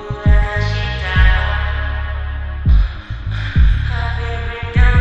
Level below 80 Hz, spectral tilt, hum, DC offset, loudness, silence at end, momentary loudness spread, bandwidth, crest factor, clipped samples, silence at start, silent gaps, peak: -16 dBFS; -7 dB/octave; none; 2%; -18 LUFS; 0 s; 9 LU; 6.4 kHz; 14 dB; under 0.1%; 0 s; none; 0 dBFS